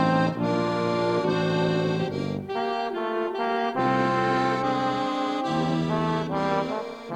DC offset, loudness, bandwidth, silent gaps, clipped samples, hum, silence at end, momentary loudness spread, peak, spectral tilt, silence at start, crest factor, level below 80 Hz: under 0.1%; -25 LUFS; 10 kHz; none; under 0.1%; none; 0 s; 5 LU; -8 dBFS; -6.5 dB/octave; 0 s; 16 dB; -58 dBFS